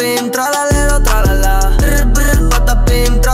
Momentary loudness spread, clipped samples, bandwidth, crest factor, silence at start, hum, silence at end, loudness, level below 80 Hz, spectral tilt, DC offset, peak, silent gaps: 2 LU; under 0.1%; 15.5 kHz; 8 dB; 0 s; none; 0 s; -13 LUFS; -12 dBFS; -4.5 dB/octave; under 0.1%; 0 dBFS; none